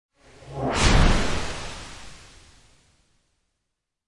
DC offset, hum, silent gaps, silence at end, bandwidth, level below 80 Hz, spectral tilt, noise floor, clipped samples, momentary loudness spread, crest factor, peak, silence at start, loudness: under 0.1%; none; none; 1.75 s; 11.5 kHz; -28 dBFS; -4.5 dB/octave; -80 dBFS; under 0.1%; 22 LU; 20 dB; -6 dBFS; 0.25 s; -23 LUFS